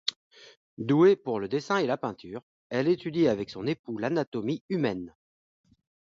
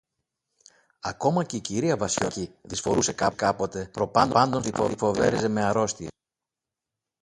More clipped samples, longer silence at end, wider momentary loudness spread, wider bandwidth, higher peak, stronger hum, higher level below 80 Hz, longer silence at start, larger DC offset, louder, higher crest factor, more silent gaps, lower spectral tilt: neither; second, 0.95 s vs 1.1 s; first, 16 LU vs 10 LU; second, 7.6 kHz vs 11.5 kHz; second, -10 dBFS vs -4 dBFS; neither; second, -66 dBFS vs -54 dBFS; second, 0.05 s vs 1.05 s; neither; second, -28 LUFS vs -25 LUFS; about the same, 18 dB vs 22 dB; first, 0.16-0.31 s, 0.57-0.77 s, 2.43-2.70 s, 3.79-3.84 s, 4.27-4.32 s, 4.61-4.69 s vs none; first, -6.5 dB/octave vs -4.5 dB/octave